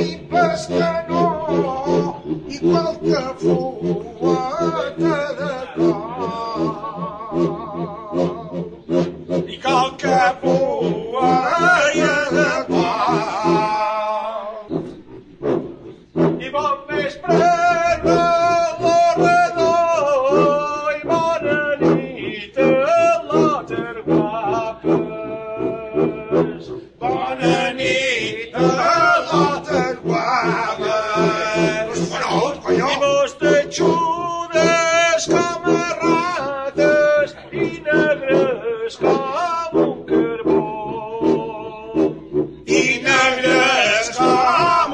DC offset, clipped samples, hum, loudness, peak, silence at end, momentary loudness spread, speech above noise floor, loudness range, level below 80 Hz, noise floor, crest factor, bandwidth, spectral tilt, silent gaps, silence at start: under 0.1%; under 0.1%; none; -18 LUFS; -2 dBFS; 0 s; 10 LU; 20 dB; 6 LU; -50 dBFS; -39 dBFS; 16 dB; 9.8 kHz; -5 dB/octave; none; 0 s